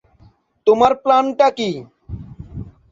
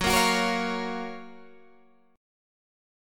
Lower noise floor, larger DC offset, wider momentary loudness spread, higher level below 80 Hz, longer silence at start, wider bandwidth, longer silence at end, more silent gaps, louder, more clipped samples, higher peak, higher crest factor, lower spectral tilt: second, -52 dBFS vs -60 dBFS; neither; about the same, 21 LU vs 21 LU; first, -44 dBFS vs -50 dBFS; first, 0.65 s vs 0 s; second, 7.6 kHz vs 17.5 kHz; second, 0.2 s vs 0.95 s; neither; first, -16 LUFS vs -26 LUFS; neither; first, -2 dBFS vs -10 dBFS; about the same, 18 dB vs 20 dB; first, -6 dB/octave vs -3 dB/octave